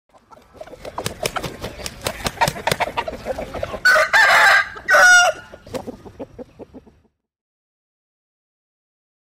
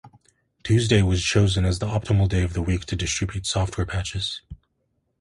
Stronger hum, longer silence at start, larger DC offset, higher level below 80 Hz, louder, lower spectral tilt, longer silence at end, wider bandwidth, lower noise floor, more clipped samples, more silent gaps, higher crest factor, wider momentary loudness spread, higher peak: neither; first, 0.6 s vs 0.05 s; neither; second, -46 dBFS vs -34 dBFS; first, -15 LUFS vs -23 LUFS; second, -1.5 dB/octave vs -5 dB/octave; first, 2.5 s vs 0.65 s; first, 16 kHz vs 11.5 kHz; second, -60 dBFS vs -72 dBFS; neither; neither; about the same, 16 dB vs 18 dB; first, 25 LU vs 8 LU; about the same, -4 dBFS vs -4 dBFS